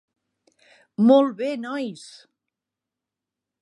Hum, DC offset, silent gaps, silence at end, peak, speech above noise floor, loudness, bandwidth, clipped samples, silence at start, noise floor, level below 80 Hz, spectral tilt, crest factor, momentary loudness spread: none; under 0.1%; none; 1.55 s; -4 dBFS; 66 dB; -21 LUFS; 11 kHz; under 0.1%; 1 s; -87 dBFS; -80 dBFS; -6.5 dB/octave; 22 dB; 20 LU